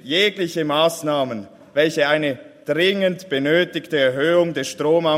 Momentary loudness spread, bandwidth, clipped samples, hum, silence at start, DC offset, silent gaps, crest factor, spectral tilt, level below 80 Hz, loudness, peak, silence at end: 8 LU; 16 kHz; under 0.1%; none; 0.05 s; under 0.1%; none; 16 dB; -4.5 dB/octave; -66 dBFS; -19 LUFS; -4 dBFS; 0 s